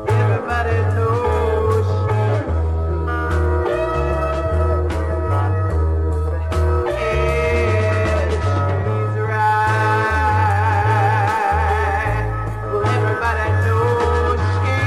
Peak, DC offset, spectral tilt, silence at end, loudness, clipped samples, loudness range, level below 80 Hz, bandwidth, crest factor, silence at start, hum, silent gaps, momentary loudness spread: -4 dBFS; under 0.1%; -7 dB/octave; 0 s; -18 LUFS; under 0.1%; 3 LU; -26 dBFS; 11.5 kHz; 12 dB; 0 s; none; none; 4 LU